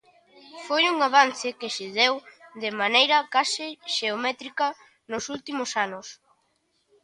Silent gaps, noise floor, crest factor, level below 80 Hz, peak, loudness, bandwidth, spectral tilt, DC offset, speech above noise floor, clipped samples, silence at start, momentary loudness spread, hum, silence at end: none; -71 dBFS; 22 dB; -74 dBFS; -4 dBFS; -24 LUFS; 11.5 kHz; -1 dB/octave; under 0.1%; 46 dB; under 0.1%; 0.45 s; 14 LU; none; 0.9 s